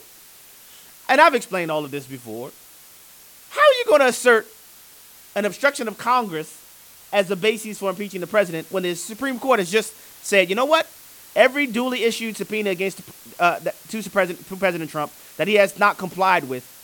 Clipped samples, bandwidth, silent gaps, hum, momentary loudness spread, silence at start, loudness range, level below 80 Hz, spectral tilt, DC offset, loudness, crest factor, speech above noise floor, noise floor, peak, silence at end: under 0.1%; 19 kHz; none; none; 16 LU; 1.1 s; 4 LU; -68 dBFS; -3.5 dB/octave; under 0.1%; -20 LUFS; 20 dB; 26 dB; -47 dBFS; 0 dBFS; 0.15 s